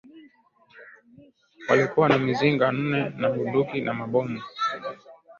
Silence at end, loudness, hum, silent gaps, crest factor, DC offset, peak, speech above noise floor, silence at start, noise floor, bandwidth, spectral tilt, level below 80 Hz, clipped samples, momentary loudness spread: 0.05 s; -24 LUFS; none; none; 20 dB; under 0.1%; -6 dBFS; 35 dB; 0.15 s; -58 dBFS; 7.2 kHz; -7 dB/octave; -64 dBFS; under 0.1%; 13 LU